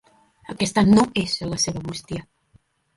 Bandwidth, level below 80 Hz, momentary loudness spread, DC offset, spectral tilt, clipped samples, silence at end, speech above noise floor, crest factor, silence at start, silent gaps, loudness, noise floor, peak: 11.5 kHz; -48 dBFS; 18 LU; under 0.1%; -4.5 dB/octave; under 0.1%; 0.75 s; 39 dB; 18 dB; 0.5 s; none; -21 LUFS; -60 dBFS; -4 dBFS